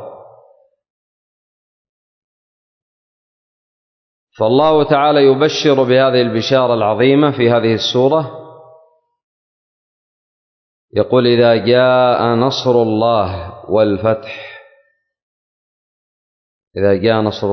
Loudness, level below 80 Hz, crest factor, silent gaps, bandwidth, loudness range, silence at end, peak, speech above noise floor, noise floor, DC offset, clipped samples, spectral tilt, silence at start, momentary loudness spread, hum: -13 LUFS; -48 dBFS; 14 dB; 0.90-4.27 s, 9.24-10.88 s, 15.22-16.71 s; 6.4 kHz; 9 LU; 0 s; -2 dBFS; 44 dB; -57 dBFS; under 0.1%; under 0.1%; -6.5 dB/octave; 0 s; 9 LU; none